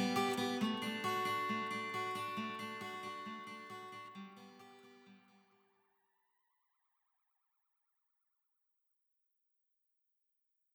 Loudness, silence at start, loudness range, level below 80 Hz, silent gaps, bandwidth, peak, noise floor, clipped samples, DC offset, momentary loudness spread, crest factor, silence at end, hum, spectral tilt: -40 LUFS; 0 s; 19 LU; under -90 dBFS; none; over 20 kHz; -24 dBFS; -84 dBFS; under 0.1%; under 0.1%; 19 LU; 20 dB; 5.55 s; none; -4 dB/octave